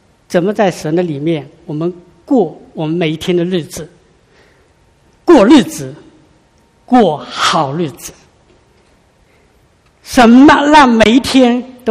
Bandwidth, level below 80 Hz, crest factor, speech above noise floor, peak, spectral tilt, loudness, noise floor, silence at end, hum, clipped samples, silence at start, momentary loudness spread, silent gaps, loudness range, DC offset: 15.5 kHz; -42 dBFS; 12 dB; 40 dB; 0 dBFS; -5 dB/octave; -11 LUFS; -51 dBFS; 0 s; none; 0.5%; 0.3 s; 16 LU; none; 8 LU; under 0.1%